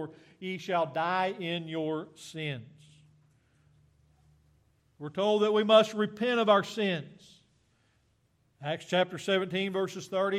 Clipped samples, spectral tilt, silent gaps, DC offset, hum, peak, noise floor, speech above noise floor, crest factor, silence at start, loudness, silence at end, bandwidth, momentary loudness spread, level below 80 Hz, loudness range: under 0.1%; -5 dB/octave; none; under 0.1%; none; -8 dBFS; -71 dBFS; 41 dB; 22 dB; 0 s; -29 LUFS; 0 s; 14 kHz; 17 LU; -76 dBFS; 12 LU